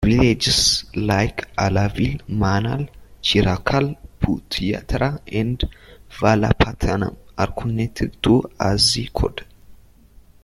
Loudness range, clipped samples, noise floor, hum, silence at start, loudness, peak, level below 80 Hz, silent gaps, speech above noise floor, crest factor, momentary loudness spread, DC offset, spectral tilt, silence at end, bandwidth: 3 LU; under 0.1%; -48 dBFS; none; 0 s; -20 LUFS; 0 dBFS; -32 dBFS; none; 29 dB; 20 dB; 9 LU; under 0.1%; -4.5 dB/octave; 0.7 s; 14 kHz